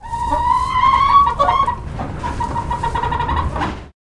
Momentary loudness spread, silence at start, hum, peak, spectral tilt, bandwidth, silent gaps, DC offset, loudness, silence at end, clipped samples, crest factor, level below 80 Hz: 13 LU; 0 s; none; -2 dBFS; -5.5 dB/octave; 11.5 kHz; none; under 0.1%; -17 LUFS; 0.1 s; under 0.1%; 16 dB; -30 dBFS